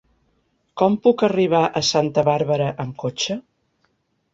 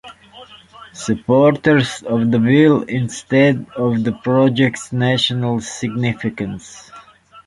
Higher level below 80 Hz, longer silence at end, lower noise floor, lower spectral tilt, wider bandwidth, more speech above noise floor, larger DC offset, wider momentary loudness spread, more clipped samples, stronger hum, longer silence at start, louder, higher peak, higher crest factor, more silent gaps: second, -60 dBFS vs -52 dBFS; first, 0.95 s vs 0.05 s; first, -68 dBFS vs -43 dBFS; about the same, -5 dB/octave vs -6 dB/octave; second, 7.8 kHz vs 11.5 kHz; first, 49 dB vs 27 dB; neither; second, 10 LU vs 14 LU; neither; neither; first, 0.75 s vs 0.05 s; second, -20 LUFS vs -16 LUFS; about the same, -4 dBFS vs -2 dBFS; about the same, 18 dB vs 16 dB; neither